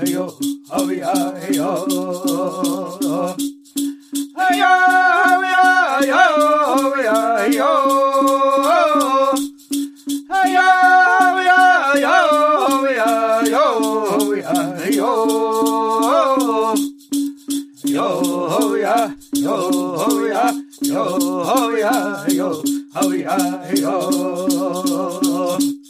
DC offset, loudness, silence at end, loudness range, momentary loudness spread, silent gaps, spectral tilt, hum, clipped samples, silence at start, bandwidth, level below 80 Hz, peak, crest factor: under 0.1%; -16 LUFS; 0.1 s; 6 LU; 10 LU; none; -3.5 dB/octave; none; under 0.1%; 0 s; 15.5 kHz; -66 dBFS; -2 dBFS; 16 dB